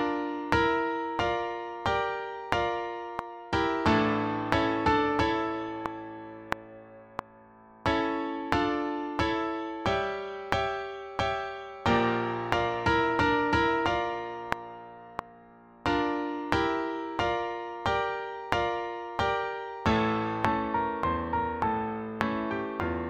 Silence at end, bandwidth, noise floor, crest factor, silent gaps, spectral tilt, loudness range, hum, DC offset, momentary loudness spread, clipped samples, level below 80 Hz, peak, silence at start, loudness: 0 s; 11 kHz; -54 dBFS; 24 dB; none; -6 dB/octave; 4 LU; none; under 0.1%; 11 LU; under 0.1%; -48 dBFS; -4 dBFS; 0 s; -29 LUFS